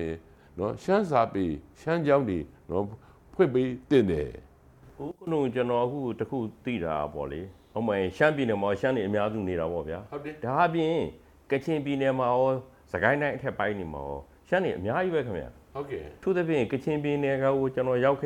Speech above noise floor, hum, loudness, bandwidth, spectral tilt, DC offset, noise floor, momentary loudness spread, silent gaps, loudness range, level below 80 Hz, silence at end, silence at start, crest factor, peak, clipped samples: 27 dB; none; -28 LUFS; 12 kHz; -7.5 dB/octave; under 0.1%; -54 dBFS; 13 LU; none; 3 LU; -54 dBFS; 0 s; 0 s; 22 dB; -6 dBFS; under 0.1%